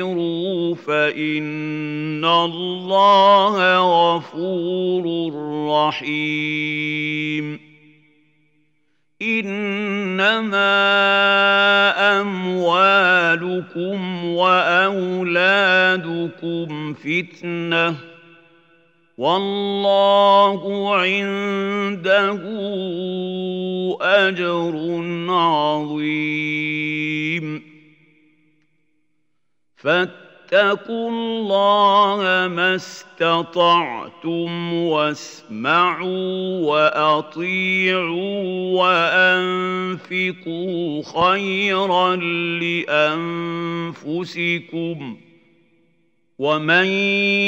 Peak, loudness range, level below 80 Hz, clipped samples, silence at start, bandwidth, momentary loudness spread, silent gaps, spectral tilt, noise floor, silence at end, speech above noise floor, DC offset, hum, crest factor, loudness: -2 dBFS; 8 LU; -72 dBFS; under 0.1%; 0 s; 8.2 kHz; 12 LU; none; -5.5 dB/octave; -76 dBFS; 0 s; 58 dB; under 0.1%; none; 18 dB; -18 LUFS